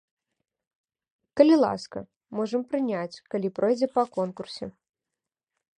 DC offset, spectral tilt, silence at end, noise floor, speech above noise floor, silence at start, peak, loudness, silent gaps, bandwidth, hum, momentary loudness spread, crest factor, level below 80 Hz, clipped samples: under 0.1%; -6.5 dB/octave; 1.1 s; -88 dBFS; 63 dB; 1.35 s; -4 dBFS; -25 LUFS; 2.16-2.21 s; 9.8 kHz; none; 18 LU; 22 dB; -68 dBFS; under 0.1%